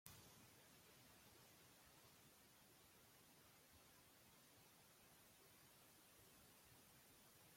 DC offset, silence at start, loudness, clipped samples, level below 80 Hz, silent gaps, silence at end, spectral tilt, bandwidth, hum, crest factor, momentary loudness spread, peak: under 0.1%; 0.05 s; -68 LUFS; under 0.1%; -88 dBFS; none; 0 s; -2.5 dB/octave; 16.5 kHz; none; 36 dB; 2 LU; -34 dBFS